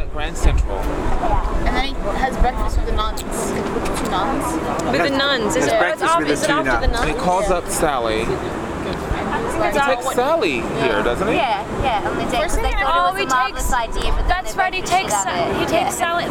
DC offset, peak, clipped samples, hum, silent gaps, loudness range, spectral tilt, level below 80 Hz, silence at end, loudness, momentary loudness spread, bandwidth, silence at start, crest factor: under 0.1%; -2 dBFS; under 0.1%; none; none; 4 LU; -4 dB/octave; -26 dBFS; 0 s; -19 LUFS; 6 LU; 17.5 kHz; 0 s; 16 dB